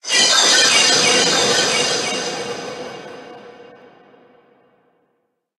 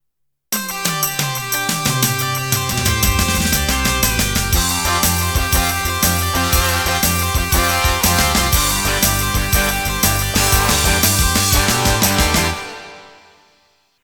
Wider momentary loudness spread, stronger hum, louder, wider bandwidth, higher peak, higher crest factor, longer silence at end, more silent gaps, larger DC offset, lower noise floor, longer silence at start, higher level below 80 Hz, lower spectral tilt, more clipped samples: first, 21 LU vs 5 LU; neither; about the same, -13 LUFS vs -15 LUFS; second, 12.5 kHz vs over 20 kHz; about the same, 0 dBFS vs 0 dBFS; about the same, 18 dB vs 16 dB; first, 1.95 s vs 0.95 s; neither; neither; second, -69 dBFS vs -74 dBFS; second, 0.05 s vs 0.5 s; second, -64 dBFS vs -24 dBFS; second, 0 dB/octave vs -2.5 dB/octave; neither